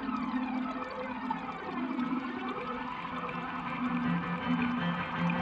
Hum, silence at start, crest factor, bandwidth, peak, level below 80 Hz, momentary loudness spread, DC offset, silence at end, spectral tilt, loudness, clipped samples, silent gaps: none; 0 s; 14 dB; 7.4 kHz; -20 dBFS; -62 dBFS; 6 LU; under 0.1%; 0 s; -7.5 dB/octave; -34 LUFS; under 0.1%; none